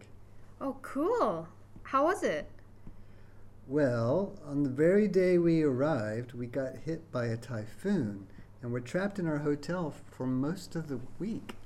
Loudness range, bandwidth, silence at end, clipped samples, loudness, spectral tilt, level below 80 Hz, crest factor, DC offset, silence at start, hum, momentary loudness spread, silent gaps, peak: 6 LU; 13.5 kHz; 0 s; under 0.1%; -32 LUFS; -7.5 dB/octave; -56 dBFS; 16 dB; under 0.1%; 0 s; none; 14 LU; none; -16 dBFS